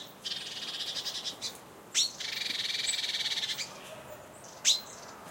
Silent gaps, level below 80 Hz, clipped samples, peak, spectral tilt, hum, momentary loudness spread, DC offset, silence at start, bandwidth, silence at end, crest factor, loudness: none; -74 dBFS; under 0.1%; -12 dBFS; 1 dB/octave; none; 18 LU; under 0.1%; 0 s; 16.5 kHz; 0 s; 24 dB; -31 LUFS